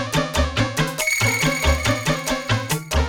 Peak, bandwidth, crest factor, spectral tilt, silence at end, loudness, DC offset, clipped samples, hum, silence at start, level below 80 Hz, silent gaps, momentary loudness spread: -4 dBFS; 18 kHz; 18 dB; -4 dB/octave; 0 s; -20 LUFS; under 0.1%; under 0.1%; none; 0 s; -28 dBFS; none; 4 LU